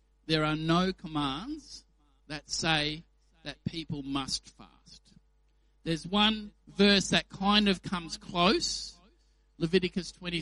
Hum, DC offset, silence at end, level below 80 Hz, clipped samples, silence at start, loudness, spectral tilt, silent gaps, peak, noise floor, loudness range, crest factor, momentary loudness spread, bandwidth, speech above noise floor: none; under 0.1%; 0 s; -54 dBFS; under 0.1%; 0.3 s; -29 LUFS; -4 dB/octave; none; -8 dBFS; -67 dBFS; 7 LU; 22 dB; 18 LU; 11.5 kHz; 37 dB